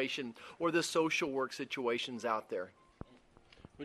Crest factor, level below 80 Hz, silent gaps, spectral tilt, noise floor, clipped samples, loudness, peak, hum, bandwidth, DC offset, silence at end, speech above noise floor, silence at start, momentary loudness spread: 18 dB; -68 dBFS; none; -3.5 dB/octave; -63 dBFS; under 0.1%; -36 LUFS; -20 dBFS; none; 13 kHz; under 0.1%; 0 s; 27 dB; 0 s; 23 LU